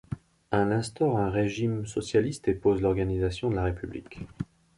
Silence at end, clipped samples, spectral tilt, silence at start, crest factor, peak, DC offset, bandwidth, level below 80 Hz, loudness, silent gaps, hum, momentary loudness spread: 0.35 s; under 0.1%; -7 dB/octave; 0.1 s; 18 dB; -10 dBFS; under 0.1%; 11.5 kHz; -44 dBFS; -28 LUFS; none; none; 14 LU